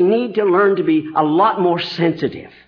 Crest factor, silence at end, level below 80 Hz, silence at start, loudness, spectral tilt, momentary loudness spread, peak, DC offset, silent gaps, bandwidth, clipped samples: 12 dB; 0.2 s; -58 dBFS; 0 s; -16 LUFS; -8 dB/octave; 5 LU; -4 dBFS; under 0.1%; none; 5.4 kHz; under 0.1%